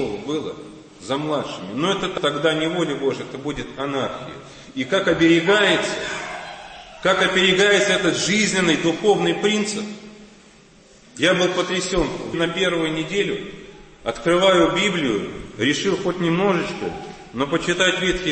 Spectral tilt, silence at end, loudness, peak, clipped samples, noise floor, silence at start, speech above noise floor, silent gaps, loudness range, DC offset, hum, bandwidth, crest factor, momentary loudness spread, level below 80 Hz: -4 dB/octave; 0 s; -20 LUFS; -4 dBFS; under 0.1%; -49 dBFS; 0 s; 29 dB; none; 6 LU; under 0.1%; none; 8.8 kHz; 16 dB; 17 LU; -46 dBFS